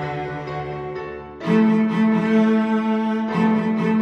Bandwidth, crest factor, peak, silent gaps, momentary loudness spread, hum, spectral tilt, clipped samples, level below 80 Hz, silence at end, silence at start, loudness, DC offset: 6.4 kHz; 12 dB; -6 dBFS; none; 12 LU; none; -8 dB/octave; under 0.1%; -52 dBFS; 0 s; 0 s; -20 LUFS; under 0.1%